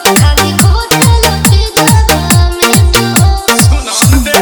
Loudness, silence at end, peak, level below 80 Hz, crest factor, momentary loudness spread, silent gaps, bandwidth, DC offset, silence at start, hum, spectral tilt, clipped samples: -7 LUFS; 0 s; 0 dBFS; -14 dBFS; 8 dB; 2 LU; none; over 20 kHz; under 0.1%; 0 s; none; -4 dB/octave; 2%